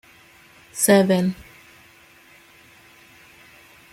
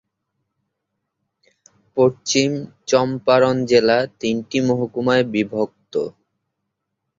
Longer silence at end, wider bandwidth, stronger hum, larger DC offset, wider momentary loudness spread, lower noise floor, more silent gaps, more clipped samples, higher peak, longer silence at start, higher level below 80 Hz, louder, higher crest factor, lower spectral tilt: first, 2.6 s vs 1.1 s; first, 16.5 kHz vs 7.6 kHz; neither; neither; first, 21 LU vs 10 LU; second, -51 dBFS vs -78 dBFS; neither; neither; about the same, -2 dBFS vs -2 dBFS; second, 0.75 s vs 1.95 s; about the same, -60 dBFS vs -60 dBFS; about the same, -18 LUFS vs -19 LUFS; about the same, 22 dB vs 20 dB; about the same, -4.5 dB/octave vs -4.5 dB/octave